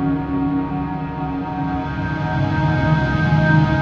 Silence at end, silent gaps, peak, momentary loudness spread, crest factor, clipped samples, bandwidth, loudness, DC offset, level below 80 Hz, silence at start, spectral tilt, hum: 0 s; none; -2 dBFS; 9 LU; 16 dB; under 0.1%; 6.6 kHz; -20 LUFS; under 0.1%; -34 dBFS; 0 s; -8.5 dB/octave; none